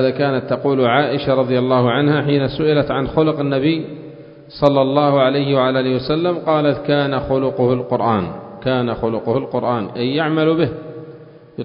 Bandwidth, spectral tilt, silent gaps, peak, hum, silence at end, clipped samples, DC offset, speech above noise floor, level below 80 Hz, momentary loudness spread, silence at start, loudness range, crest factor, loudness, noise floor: 5.4 kHz; -9.5 dB/octave; none; 0 dBFS; none; 0 s; under 0.1%; under 0.1%; 23 dB; -46 dBFS; 7 LU; 0 s; 3 LU; 16 dB; -17 LUFS; -39 dBFS